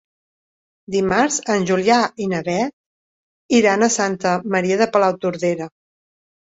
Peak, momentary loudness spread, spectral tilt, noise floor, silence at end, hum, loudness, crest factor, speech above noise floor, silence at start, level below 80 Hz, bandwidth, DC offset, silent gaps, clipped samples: -2 dBFS; 7 LU; -4 dB/octave; under -90 dBFS; 0.9 s; none; -18 LUFS; 18 dB; over 72 dB; 0.9 s; -58 dBFS; 8 kHz; under 0.1%; 2.73-3.49 s; under 0.1%